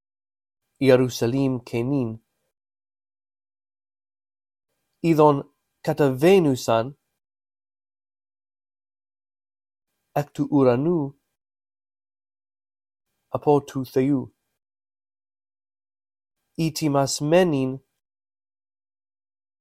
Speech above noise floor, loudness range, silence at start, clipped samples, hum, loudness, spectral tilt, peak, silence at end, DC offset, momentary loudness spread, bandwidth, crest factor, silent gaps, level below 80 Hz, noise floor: over 70 dB; 9 LU; 0.8 s; under 0.1%; none; -22 LUFS; -6.5 dB/octave; -2 dBFS; 1.8 s; under 0.1%; 14 LU; 16 kHz; 22 dB; none; -60 dBFS; under -90 dBFS